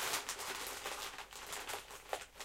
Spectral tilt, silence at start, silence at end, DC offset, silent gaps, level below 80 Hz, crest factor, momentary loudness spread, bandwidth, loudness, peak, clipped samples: 0 dB/octave; 0 s; 0 s; under 0.1%; none; -66 dBFS; 22 dB; 7 LU; 17 kHz; -43 LUFS; -22 dBFS; under 0.1%